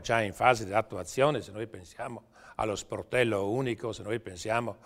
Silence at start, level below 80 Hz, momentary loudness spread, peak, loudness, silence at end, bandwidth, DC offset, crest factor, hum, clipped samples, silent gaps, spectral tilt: 0 s; -58 dBFS; 15 LU; -6 dBFS; -30 LUFS; 0.1 s; 16 kHz; under 0.1%; 24 dB; none; under 0.1%; none; -5 dB/octave